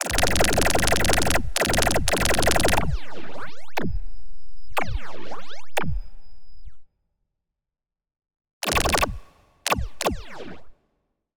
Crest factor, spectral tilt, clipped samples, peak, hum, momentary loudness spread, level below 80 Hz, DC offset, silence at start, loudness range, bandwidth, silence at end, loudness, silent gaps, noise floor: 18 dB; -3 dB/octave; under 0.1%; -4 dBFS; none; 19 LU; -34 dBFS; under 0.1%; 0 s; 14 LU; over 20 kHz; 0 s; -23 LUFS; 8.53-8.61 s; -87 dBFS